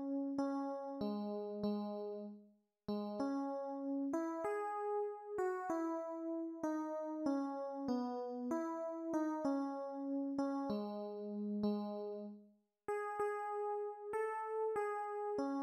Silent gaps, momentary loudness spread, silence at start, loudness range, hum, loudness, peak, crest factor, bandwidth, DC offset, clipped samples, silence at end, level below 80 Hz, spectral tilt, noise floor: none; 5 LU; 0 s; 2 LU; none; -41 LUFS; -26 dBFS; 14 dB; 12.5 kHz; under 0.1%; under 0.1%; 0 s; -80 dBFS; -7 dB/octave; -67 dBFS